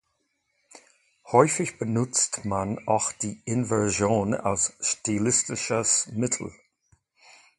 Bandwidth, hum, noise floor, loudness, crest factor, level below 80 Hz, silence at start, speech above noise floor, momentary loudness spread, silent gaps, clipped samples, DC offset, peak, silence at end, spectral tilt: 11.5 kHz; none; -75 dBFS; -25 LUFS; 24 dB; -56 dBFS; 0.75 s; 49 dB; 7 LU; none; under 0.1%; under 0.1%; -2 dBFS; 1.1 s; -4 dB/octave